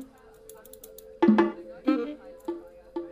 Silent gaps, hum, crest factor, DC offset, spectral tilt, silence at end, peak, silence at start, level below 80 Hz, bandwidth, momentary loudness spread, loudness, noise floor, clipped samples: none; none; 20 dB; under 0.1%; -7 dB/octave; 0 s; -8 dBFS; 0 s; -62 dBFS; 15.5 kHz; 25 LU; -27 LUFS; -51 dBFS; under 0.1%